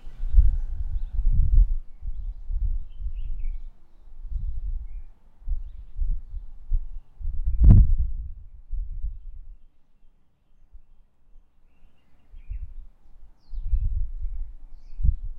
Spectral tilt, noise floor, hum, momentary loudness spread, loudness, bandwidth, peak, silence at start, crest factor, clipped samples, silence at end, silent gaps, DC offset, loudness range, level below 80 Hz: -11.5 dB/octave; -56 dBFS; none; 20 LU; -28 LUFS; 1.2 kHz; 0 dBFS; 0.05 s; 24 dB; under 0.1%; 0 s; none; under 0.1%; 21 LU; -26 dBFS